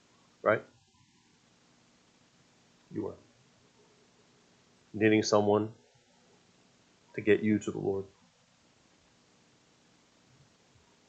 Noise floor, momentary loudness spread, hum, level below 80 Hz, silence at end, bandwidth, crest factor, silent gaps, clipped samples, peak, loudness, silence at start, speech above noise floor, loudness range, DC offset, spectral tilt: -66 dBFS; 18 LU; 60 Hz at -70 dBFS; -76 dBFS; 3.05 s; 8.2 kHz; 24 dB; none; under 0.1%; -10 dBFS; -30 LUFS; 0.45 s; 38 dB; 18 LU; under 0.1%; -5.5 dB/octave